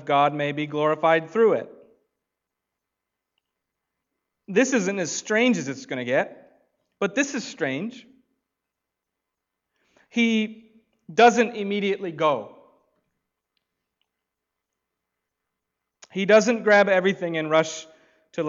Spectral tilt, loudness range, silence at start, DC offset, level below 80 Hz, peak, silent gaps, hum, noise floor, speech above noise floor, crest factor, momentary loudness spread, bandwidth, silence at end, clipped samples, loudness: -4.5 dB/octave; 9 LU; 0 s; under 0.1%; -76 dBFS; -6 dBFS; none; none; -84 dBFS; 62 dB; 20 dB; 13 LU; 7.8 kHz; 0 s; under 0.1%; -22 LUFS